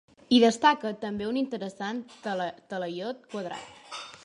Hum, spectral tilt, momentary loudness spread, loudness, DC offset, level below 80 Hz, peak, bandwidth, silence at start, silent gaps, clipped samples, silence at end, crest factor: none; -4.5 dB/octave; 17 LU; -28 LUFS; under 0.1%; -68 dBFS; -8 dBFS; 11 kHz; 0.3 s; none; under 0.1%; 0.05 s; 20 dB